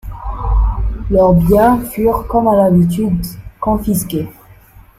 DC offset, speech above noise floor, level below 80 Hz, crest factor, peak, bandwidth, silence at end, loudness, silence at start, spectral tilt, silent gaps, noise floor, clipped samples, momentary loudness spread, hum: under 0.1%; 29 dB; -22 dBFS; 12 dB; -2 dBFS; 16 kHz; 0.2 s; -14 LUFS; 0.05 s; -7.5 dB/octave; none; -42 dBFS; under 0.1%; 12 LU; none